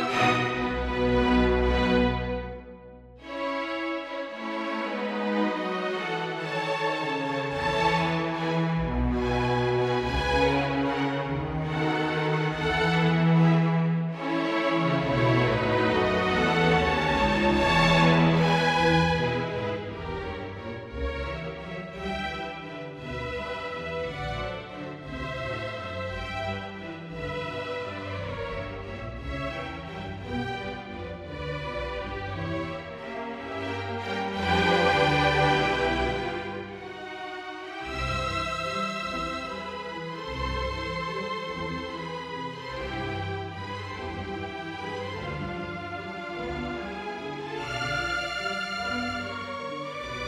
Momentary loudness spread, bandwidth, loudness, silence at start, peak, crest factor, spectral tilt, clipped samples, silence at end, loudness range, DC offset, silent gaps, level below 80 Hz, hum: 14 LU; 11 kHz; -28 LUFS; 0 s; -8 dBFS; 18 dB; -6 dB/octave; under 0.1%; 0 s; 11 LU; under 0.1%; none; -42 dBFS; none